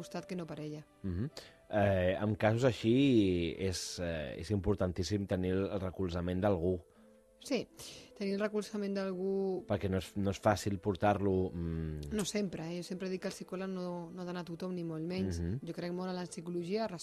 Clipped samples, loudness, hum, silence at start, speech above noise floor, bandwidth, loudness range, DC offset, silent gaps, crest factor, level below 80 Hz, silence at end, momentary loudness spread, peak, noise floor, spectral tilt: under 0.1%; -35 LUFS; none; 0 s; 28 dB; 13 kHz; 7 LU; under 0.1%; none; 20 dB; -56 dBFS; 0 s; 11 LU; -14 dBFS; -62 dBFS; -6 dB/octave